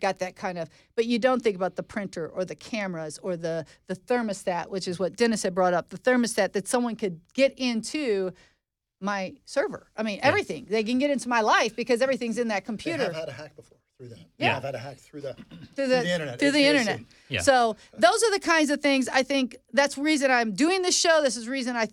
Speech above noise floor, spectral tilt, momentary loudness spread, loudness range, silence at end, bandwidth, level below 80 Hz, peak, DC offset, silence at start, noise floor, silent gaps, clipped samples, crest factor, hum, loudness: 37 dB; -3.5 dB/octave; 12 LU; 8 LU; 0.05 s; 15 kHz; -64 dBFS; -6 dBFS; under 0.1%; 0 s; -63 dBFS; none; under 0.1%; 20 dB; none; -25 LUFS